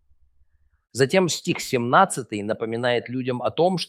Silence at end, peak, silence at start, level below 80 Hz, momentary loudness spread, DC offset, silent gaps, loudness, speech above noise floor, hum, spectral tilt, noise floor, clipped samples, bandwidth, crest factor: 0.05 s; -2 dBFS; 0.95 s; -64 dBFS; 10 LU; under 0.1%; none; -22 LUFS; 39 dB; none; -4.5 dB/octave; -61 dBFS; under 0.1%; 16 kHz; 22 dB